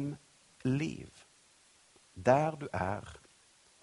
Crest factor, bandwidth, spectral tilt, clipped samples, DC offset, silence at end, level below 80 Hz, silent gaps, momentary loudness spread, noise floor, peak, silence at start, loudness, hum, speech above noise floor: 26 dB; 11.5 kHz; -7 dB/octave; under 0.1%; under 0.1%; 0.65 s; -64 dBFS; none; 24 LU; -65 dBFS; -10 dBFS; 0 s; -33 LUFS; none; 32 dB